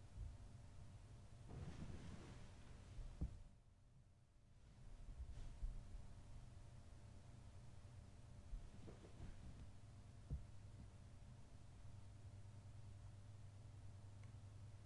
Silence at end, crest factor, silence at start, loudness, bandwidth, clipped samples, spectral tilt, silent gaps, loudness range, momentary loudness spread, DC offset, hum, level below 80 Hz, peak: 0 s; 20 dB; 0 s; -60 LUFS; 11 kHz; under 0.1%; -6.5 dB/octave; none; 3 LU; 8 LU; under 0.1%; none; -60 dBFS; -36 dBFS